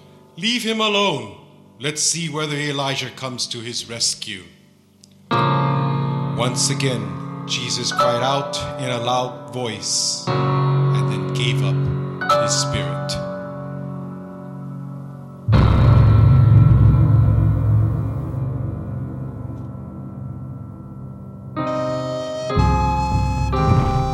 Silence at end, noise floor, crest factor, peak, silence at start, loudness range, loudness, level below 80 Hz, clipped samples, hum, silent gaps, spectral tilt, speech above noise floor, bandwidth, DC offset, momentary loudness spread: 0 s; -51 dBFS; 16 dB; -2 dBFS; 0.35 s; 10 LU; -19 LUFS; -30 dBFS; under 0.1%; none; none; -5 dB/octave; 29 dB; 12.5 kHz; under 0.1%; 18 LU